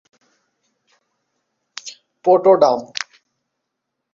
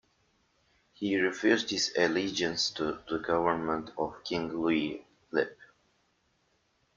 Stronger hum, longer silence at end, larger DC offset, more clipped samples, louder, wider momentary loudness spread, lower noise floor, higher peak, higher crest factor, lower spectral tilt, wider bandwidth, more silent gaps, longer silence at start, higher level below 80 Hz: neither; second, 1.1 s vs 1.3 s; neither; neither; first, -16 LUFS vs -30 LUFS; first, 22 LU vs 9 LU; first, -78 dBFS vs -73 dBFS; first, -2 dBFS vs -10 dBFS; about the same, 20 dB vs 22 dB; about the same, -4.5 dB/octave vs -3.5 dB/octave; about the same, 7.6 kHz vs 7.6 kHz; neither; first, 1.85 s vs 1 s; about the same, -68 dBFS vs -64 dBFS